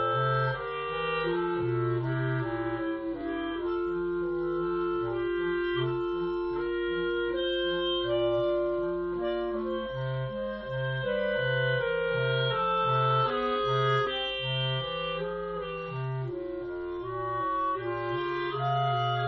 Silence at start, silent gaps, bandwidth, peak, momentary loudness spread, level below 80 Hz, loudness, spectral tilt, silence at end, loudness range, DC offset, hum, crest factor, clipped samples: 0 s; none; 6 kHz; -14 dBFS; 7 LU; -54 dBFS; -30 LUFS; -4 dB/octave; 0 s; 5 LU; under 0.1%; none; 14 dB; under 0.1%